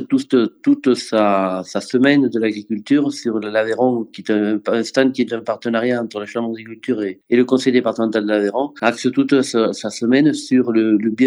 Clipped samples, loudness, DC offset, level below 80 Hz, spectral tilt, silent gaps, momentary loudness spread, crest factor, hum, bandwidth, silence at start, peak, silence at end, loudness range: under 0.1%; -18 LUFS; under 0.1%; -74 dBFS; -5.5 dB/octave; none; 8 LU; 18 dB; none; 11.5 kHz; 0 s; 0 dBFS; 0 s; 2 LU